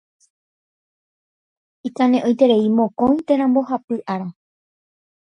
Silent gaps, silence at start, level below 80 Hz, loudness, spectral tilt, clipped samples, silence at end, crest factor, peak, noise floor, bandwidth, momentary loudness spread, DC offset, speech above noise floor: 3.84-3.88 s; 1.85 s; -60 dBFS; -18 LUFS; -7.5 dB/octave; under 0.1%; 0.95 s; 18 dB; -2 dBFS; under -90 dBFS; 6.8 kHz; 13 LU; under 0.1%; over 73 dB